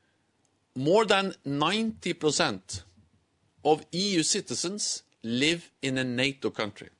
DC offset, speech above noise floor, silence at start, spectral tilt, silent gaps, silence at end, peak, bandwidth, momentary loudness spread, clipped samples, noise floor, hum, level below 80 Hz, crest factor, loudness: under 0.1%; 43 dB; 0.75 s; -3.5 dB/octave; none; 0.1 s; -10 dBFS; 11 kHz; 9 LU; under 0.1%; -71 dBFS; none; -68 dBFS; 20 dB; -27 LUFS